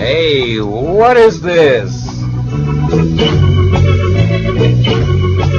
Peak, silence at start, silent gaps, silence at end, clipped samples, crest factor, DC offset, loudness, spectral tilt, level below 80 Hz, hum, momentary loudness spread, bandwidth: 0 dBFS; 0 s; none; 0 s; 0.3%; 10 dB; under 0.1%; -11 LUFS; -7 dB/octave; -26 dBFS; none; 8 LU; 7.2 kHz